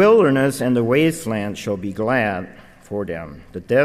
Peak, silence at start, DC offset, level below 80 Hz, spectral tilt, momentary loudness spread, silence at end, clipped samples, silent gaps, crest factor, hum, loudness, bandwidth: -2 dBFS; 0 s; under 0.1%; -50 dBFS; -6 dB/octave; 15 LU; 0 s; under 0.1%; none; 16 dB; none; -20 LUFS; 15.5 kHz